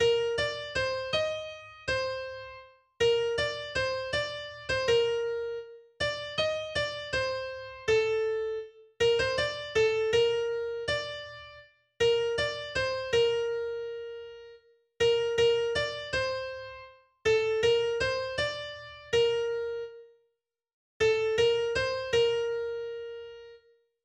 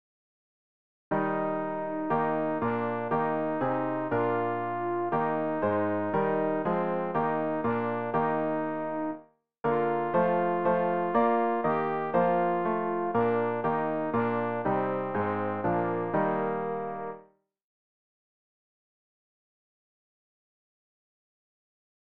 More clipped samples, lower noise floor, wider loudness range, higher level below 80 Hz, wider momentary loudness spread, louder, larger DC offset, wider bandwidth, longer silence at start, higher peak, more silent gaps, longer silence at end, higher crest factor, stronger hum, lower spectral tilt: neither; first, -79 dBFS vs -58 dBFS; about the same, 3 LU vs 5 LU; first, -56 dBFS vs -66 dBFS; first, 15 LU vs 6 LU; about the same, -29 LUFS vs -29 LUFS; second, under 0.1% vs 0.3%; first, 9.6 kHz vs 4.7 kHz; second, 0 s vs 1.1 s; about the same, -14 dBFS vs -14 dBFS; first, 20.73-21.00 s vs none; second, 0.45 s vs 4.4 s; about the same, 16 dB vs 16 dB; neither; second, -3 dB/octave vs -10.5 dB/octave